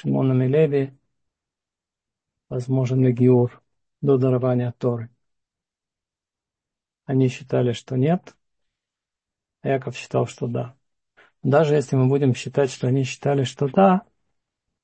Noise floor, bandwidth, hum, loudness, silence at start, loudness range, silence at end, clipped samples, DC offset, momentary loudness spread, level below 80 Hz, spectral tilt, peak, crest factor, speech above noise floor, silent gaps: -89 dBFS; 8.6 kHz; none; -21 LUFS; 0.05 s; 6 LU; 0.8 s; under 0.1%; under 0.1%; 10 LU; -64 dBFS; -8 dB/octave; -4 dBFS; 20 dB; 69 dB; none